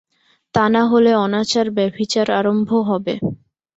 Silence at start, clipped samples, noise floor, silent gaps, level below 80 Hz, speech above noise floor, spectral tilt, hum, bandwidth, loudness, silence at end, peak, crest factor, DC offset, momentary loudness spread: 0.55 s; under 0.1%; -47 dBFS; none; -56 dBFS; 30 dB; -5.5 dB/octave; none; 8 kHz; -17 LUFS; 0.45 s; -2 dBFS; 16 dB; under 0.1%; 9 LU